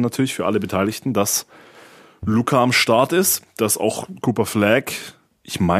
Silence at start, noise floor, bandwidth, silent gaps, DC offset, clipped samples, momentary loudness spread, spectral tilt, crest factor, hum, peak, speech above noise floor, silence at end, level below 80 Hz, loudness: 0 s; -46 dBFS; 15.5 kHz; none; under 0.1%; under 0.1%; 10 LU; -4 dB/octave; 18 dB; none; 0 dBFS; 26 dB; 0 s; -52 dBFS; -19 LUFS